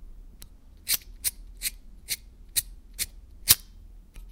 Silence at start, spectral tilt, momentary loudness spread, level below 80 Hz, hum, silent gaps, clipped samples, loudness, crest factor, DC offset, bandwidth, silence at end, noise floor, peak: 0 s; 0.5 dB/octave; 13 LU; -46 dBFS; none; none; under 0.1%; -27 LUFS; 32 dB; under 0.1%; 17.5 kHz; 0 s; -48 dBFS; 0 dBFS